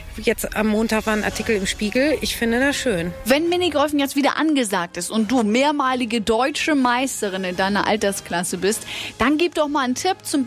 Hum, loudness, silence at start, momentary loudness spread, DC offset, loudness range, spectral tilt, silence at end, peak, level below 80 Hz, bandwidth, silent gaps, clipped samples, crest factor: none; -20 LUFS; 0 s; 5 LU; under 0.1%; 1 LU; -3.5 dB/octave; 0 s; -6 dBFS; -44 dBFS; 16 kHz; none; under 0.1%; 14 dB